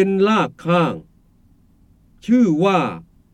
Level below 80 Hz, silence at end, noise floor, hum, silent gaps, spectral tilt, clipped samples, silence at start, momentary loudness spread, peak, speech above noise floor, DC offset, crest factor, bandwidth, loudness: -56 dBFS; 0.3 s; -54 dBFS; none; none; -7 dB/octave; under 0.1%; 0 s; 18 LU; -4 dBFS; 37 dB; under 0.1%; 16 dB; 9.2 kHz; -18 LUFS